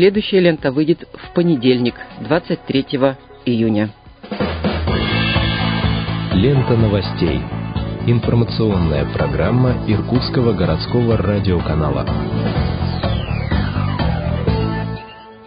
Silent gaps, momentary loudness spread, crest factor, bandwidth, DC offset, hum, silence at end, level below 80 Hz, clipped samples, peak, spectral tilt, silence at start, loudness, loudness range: none; 7 LU; 16 dB; 5.2 kHz; under 0.1%; none; 0 s; -28 dBFS; under 0.1%; 0 dBFS; -12.5 dB/octave; 0 s; -18 LUFS; 2 LU